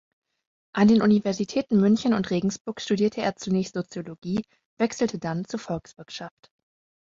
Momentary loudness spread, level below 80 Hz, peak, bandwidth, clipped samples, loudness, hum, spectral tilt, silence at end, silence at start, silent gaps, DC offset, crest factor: 16 LU; -60 dBFS; -8 dBFS; 7.6 kHz; under 0.1%; -25 LUFS; none; -6 dB/octave; 0.8 s; 0.75 s; 2.61-2.65 s, 4.18-4.22 s, 4.65-4.77 s; under 0.1%; 16 dB